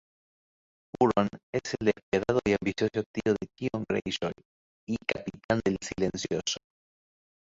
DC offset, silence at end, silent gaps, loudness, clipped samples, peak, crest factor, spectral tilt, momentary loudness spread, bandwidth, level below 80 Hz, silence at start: under 0.1%; 0.95 s; 1.43-1.53 s, 2.03-2.12 s, 3.06-3.14 s, 4.45-4.87 s, 5.44-5.49 s; -30 LUFS; under 0.1%; -10 dBFS; 22 dB; -5 dB/octave; 10 LU; 8 kHz; -56 dBFS; 1 s